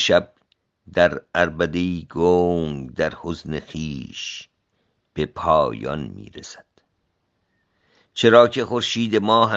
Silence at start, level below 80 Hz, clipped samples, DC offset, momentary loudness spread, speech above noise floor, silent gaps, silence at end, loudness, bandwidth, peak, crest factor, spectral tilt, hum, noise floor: 0 s; -50 dBFS; under 0.1%; under 0.1%; 19 LU; 51 dB; none; 0 s; -21 LUFS; 8 kHz; 0 dBFS; 22 dB; -5 dB/octave; none; -71 dBFS